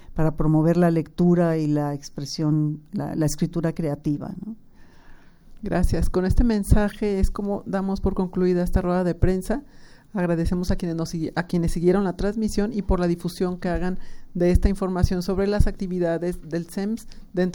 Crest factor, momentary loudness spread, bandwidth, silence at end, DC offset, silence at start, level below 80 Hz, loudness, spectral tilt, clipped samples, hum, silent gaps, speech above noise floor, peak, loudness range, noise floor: 20 dB; 9 LU; 18 kHz; 0 s; under 0.1%; 0 s; -30 dBFS; -24 LUFS; -7.5 dB/octave; under 0.1%; none; none; 23 dB; -2 dBFS; 4 LU; -45 dBFS